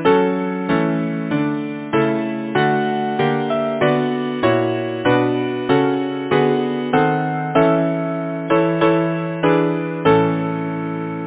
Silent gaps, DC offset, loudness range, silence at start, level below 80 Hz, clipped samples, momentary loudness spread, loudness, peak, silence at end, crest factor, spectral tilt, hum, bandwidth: none; under 0.1%; 2 LU; 0 s; -54 dBFS; under 0.1%; 6 LU; -18 LUFS; 0 dBFS; 0 s; 18 dB; -11 dB/octave; none; 4 kHz